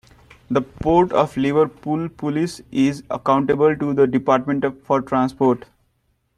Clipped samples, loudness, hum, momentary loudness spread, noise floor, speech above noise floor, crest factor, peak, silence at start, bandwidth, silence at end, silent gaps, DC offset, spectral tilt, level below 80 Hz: under 0.1%; -20 LUFS; none; 8 LU; -66 dBFS; 48 dB; 18 dB; -2 dBFS; 0.5 s; 12 kHz; 0.8 s; none; under 0.1%; -7 dB/octave; -48 dBFS